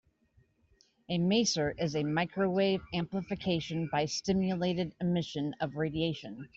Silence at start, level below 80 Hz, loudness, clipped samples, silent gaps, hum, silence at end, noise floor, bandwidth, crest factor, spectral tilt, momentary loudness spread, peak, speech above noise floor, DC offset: 1.1 s; -60 dBFS; -32 LUFS; under 0.1%; none; none; 0.1 s; -69 dBFS; 8 kHz; 16 dB; -5 dB/octave; 7 LU; -16 dBFS; 37 dB; under 0.1%